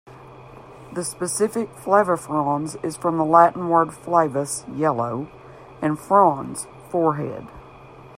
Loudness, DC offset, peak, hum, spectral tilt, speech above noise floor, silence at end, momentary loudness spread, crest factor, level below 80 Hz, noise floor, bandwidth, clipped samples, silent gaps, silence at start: -21 LUFS; under 0.1%; 0 dBFS; none; -5.5 dB/octave; 23 dB; 0 s; 15 LU; 22 dB; -58 dBFS; -44 dBFS; 16 kHz; under 0.1%; none; 0.05 s